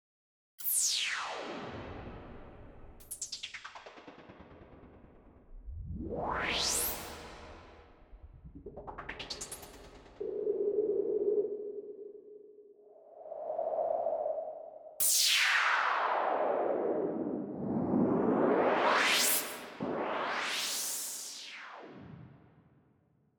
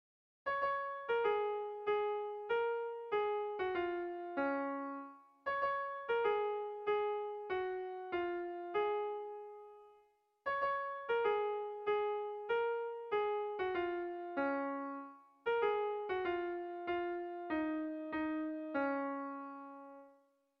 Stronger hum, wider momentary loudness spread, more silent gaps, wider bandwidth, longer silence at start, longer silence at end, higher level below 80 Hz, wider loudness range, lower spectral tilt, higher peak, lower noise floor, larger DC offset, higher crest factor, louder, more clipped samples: neither; first, 23 LU vs 10 LU; neither; first, over 20 kHz vs 5.6 kHz; first, 0.6 s vs 0.45 s; first, 1 s vs 0.5 s; first, -58 dBFS vs -76 dBFS; first, 16 LU vs 3 LU; about the same, -2 dB/octave vs -2 dB/octave; first, -14 dBFS vs -24 dBFS; about the same, -70 dBFS vs -71 dBFS; neither; first, 22 dB vs 16 dB; first, -32 LUFS vs -38 LUFS; neither